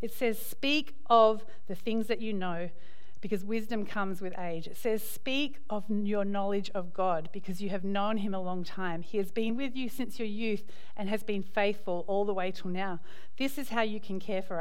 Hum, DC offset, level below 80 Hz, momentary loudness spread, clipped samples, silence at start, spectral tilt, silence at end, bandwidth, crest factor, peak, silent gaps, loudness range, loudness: none; 3%; -68 dBFS; 9 LU; under 0.1%; 0 s; -5.5 dB/octave; 0 s; 16.5 kHz; 22 dB; -10 dBFS; none; 5 LU; -33 LUFS